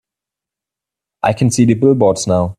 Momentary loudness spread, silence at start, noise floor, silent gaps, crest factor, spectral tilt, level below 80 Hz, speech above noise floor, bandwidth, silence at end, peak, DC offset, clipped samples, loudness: 6 LU; 1.25 s; -86 dBFS; none; 14 dB; -6 dB/octave; -50 dBFS; 73 dB; 13.5 kHz; 0.05 s; 0 dBFS; under 0.1%; under 0.1%; -13 LUFS